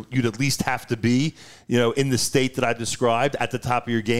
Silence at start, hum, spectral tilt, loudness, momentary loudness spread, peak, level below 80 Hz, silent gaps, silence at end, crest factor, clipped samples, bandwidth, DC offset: 0 s; none; -4.5 dB/octave; -23 LUFS; 4 LU; -6 dBFS; -52 dBFS; none; 0 s; 16 dB; under 0.1%; 16 kHz; 0.8%